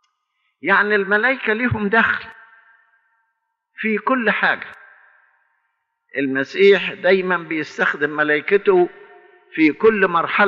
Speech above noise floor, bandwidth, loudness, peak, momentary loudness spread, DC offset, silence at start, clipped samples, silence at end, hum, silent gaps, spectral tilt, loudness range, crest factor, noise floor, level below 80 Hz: 56 dB; 7.2 kHz; -18 LUFS; -4 dBFS; 10 LU; under 0.1%; 0.65 s; under 0.1%; 0 s; none; none; -3 dB/octave; 6 LU; 16 dB; -73 dBFS; -58 dBFS